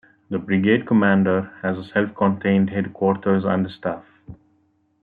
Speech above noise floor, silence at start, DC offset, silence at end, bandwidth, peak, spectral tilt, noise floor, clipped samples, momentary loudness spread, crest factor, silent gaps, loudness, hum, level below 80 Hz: 44 dB; 0.3 s; under 0.1%; 0.7 s; 4.5 kHz; -4 dBFS; -10.5 dB/octave; -64 dBFS; under 0.1%; 12 LU; 18 dB; none; -21 LUFS; none; -60 dBFS